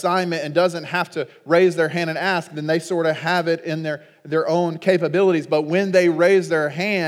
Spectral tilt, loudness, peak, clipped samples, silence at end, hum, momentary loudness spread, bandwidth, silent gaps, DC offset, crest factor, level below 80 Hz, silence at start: -6 dB/octave; -20 LUFS; -4 dBFS; under 0.1%; 0 s; none; 8 LU; 15 kHz; none; under 0.1%; 16 dB; -82 dBFS; 0 s